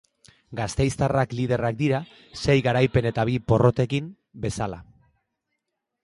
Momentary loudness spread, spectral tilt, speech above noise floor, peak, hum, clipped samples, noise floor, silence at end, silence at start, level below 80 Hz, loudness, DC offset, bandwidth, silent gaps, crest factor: 12 LU; -6.5 dB/octave; 57 dB; -4 dBFS; none; under 0.1%; -80 dBFS; 1.2 s; 0.5 s; -44 dBFS; -24 LUFS; under 0.1%; 11.5 kHz; none; 20 dB